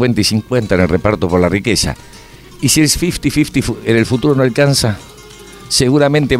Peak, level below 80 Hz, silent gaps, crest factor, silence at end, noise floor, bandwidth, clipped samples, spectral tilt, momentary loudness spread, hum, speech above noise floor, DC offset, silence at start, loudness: 0 dBFS; -32 dBFS; none; 14 dB; 0 s; -36 dBFS; 16 kHz; under 0.1%; -4.5 dB/octave; 6 LU; none; 23 dB; under 0.1%; 0 s; -13 LUFS